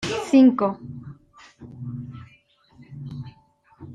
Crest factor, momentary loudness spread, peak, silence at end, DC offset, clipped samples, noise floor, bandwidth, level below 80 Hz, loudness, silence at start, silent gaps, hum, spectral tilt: 18 dB; 28 LU; -6 dBFS; 0 s; under 0.1%; under 0.1%; -57 dBFS; 10 kHz; -60 dBFS; -19 LUFS; 0 s; none; none; -6.5 dB/octave